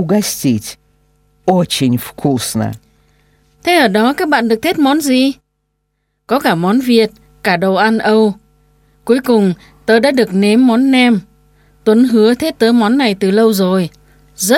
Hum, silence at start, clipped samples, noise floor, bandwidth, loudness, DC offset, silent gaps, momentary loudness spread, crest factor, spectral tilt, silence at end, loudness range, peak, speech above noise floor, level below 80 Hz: none; 0 s; under 0.1%; -67 dBFS; 17 kHz; -13 LUFS; under 0.1%; none; 10 LU; 14 dB; -5 dB/octave; 0 s; 3 LU; 0 dBFS; 56 dB; -50 dBFS